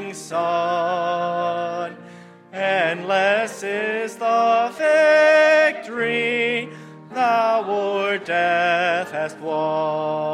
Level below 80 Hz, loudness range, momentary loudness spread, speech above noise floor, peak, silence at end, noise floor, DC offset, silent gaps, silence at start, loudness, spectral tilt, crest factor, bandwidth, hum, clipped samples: -78 dBFS; 5 LU; 12 LU; 22 dB; -4 dBFS; 0 s; -43 dBFS; under 0.1%; none; 0 s; -20 LUFS; -4 dB/octave; 16 dB; 12 kHz; none; under 0.1%